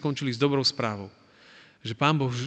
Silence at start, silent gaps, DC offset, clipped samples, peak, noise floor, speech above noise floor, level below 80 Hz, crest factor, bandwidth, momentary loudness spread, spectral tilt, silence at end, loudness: 0 s; none; under 0.1%; under 0.1%; -8 dBFS; -54 dBFS; 28 dB; -68 dBFS; 20 dB; 9 kHz; 16 LU; -5.5 dB/octave; 0 s; -26 LUFS